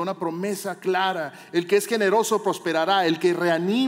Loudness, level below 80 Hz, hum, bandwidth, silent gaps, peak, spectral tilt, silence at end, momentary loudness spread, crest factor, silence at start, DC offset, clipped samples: -23 LUFS; -82 dBFS; none; 16 kHz; none; -8 dBFS; -4.5 dB/octave; 0 s; 8 LU; 14 dB; 0 s; under 0.1%; under 0.1%